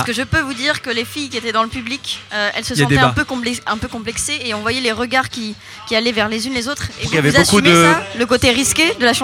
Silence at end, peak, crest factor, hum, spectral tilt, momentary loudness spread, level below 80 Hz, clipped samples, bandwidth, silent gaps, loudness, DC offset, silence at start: 0 s; 0 dBFS; 16 dB; none; -3.5 dB/octave; 12 LU; -40 dBFS; under 0.1%; 17.5 kHz; none; -16 LUFS; under 0.1%; 0 s